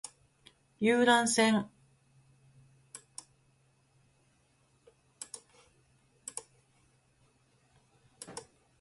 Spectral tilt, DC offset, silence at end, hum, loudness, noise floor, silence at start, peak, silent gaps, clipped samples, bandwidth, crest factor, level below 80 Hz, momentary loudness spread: -3 dB/octave; under 0.1%; 0.4 s; none; -28 LUFS; -70 dBFS; 0.8 s; -12 dBFS; none; under 0.1%; 11.5 kHz; 24 dB; -76 dBFS; 25 LU